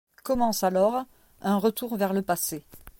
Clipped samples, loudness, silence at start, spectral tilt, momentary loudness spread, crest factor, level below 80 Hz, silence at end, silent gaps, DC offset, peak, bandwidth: under 0.1%; -26 LUFS; 0.25 s; -5 dB/octave; 10 LU; 16 dB; -54 dBFS; 0.1 s; none; under 0.1%; -12 dBFS; 17 kHz